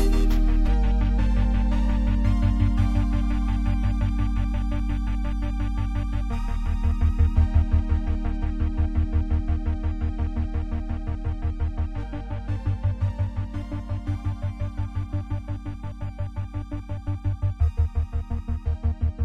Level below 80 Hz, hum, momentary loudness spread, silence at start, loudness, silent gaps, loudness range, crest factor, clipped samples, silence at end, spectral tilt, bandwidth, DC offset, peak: -24 dBFS; none; 9 LU; 0 s; -27 LUFS; none; 6 LU; 14 dB; under 0.1%; 0 s; -8.5 dB/octave; 7.4 kHz; 0.7%; -8 dBFS